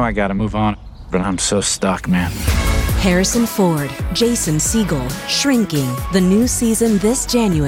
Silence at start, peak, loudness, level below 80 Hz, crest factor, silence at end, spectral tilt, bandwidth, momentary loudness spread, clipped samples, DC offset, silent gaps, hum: 0 s; -4 dBFS; -17 LUFS; -28 dBFS; 12 dB; 0 s; -4.5 dB/octave; 19.5 kHz; 5 LU; under 0.1%; under 0.1%; none; none